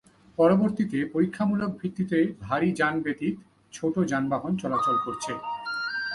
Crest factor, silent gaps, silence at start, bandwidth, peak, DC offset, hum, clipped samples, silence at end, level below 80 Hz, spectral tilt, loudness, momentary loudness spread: 18 dB; none; 0.4 s; 11.5 kHz; -8 dBFS; under 0.1%; none; under 0.1%; 0 s; -62 dBFS; -6.5 dB/octave; -26 LUFS; 9 LU